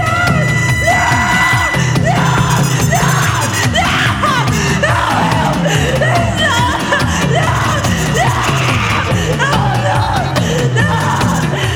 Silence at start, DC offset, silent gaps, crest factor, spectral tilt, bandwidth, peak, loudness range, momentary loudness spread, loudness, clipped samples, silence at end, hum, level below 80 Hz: 0 s; under 0.1%; none; 12 dB; -4.5 dB/octave; 19.5 kHz; 0 dBFS; 2 LU; 3 LU; -12 LUFS; under 0.1%; 0 s; none; -28 dBFS